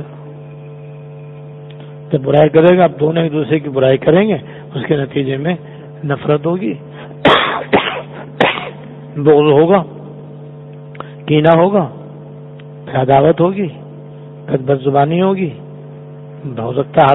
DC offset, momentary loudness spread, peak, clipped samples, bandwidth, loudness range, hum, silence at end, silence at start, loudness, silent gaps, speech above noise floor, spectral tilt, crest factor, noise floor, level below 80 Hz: under 0.1%; 23 LU; 0 dBFS; under 0.1%; 4.1 kHz; 4 LU; none; 0 s; 0 s; -13 LUFS; none; 20 dB; -9 dB/octave; 14 dB; -32 dBFS; -50 dBFS